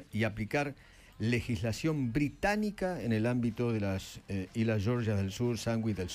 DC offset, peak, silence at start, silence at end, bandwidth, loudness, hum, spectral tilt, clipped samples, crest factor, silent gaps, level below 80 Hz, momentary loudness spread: under 0.1%; -16 dBFS; 0 s; 0 s; 15.5 kHz; -33 LUFS; none; -6.5 dB/octave; under 0.1%; 16 dB; none; -54 dBFS; 7 LU